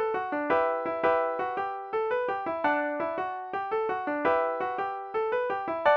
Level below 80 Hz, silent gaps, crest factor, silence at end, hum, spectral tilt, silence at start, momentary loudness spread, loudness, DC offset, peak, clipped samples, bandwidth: -68 dBFS; none; 16 dB; 0 s; none; -6.5 dB/octave; 0 s; 6 LU; -29 LUFS; under 0.1%; -12 dBFS; under 0.1%; 6.2 kHz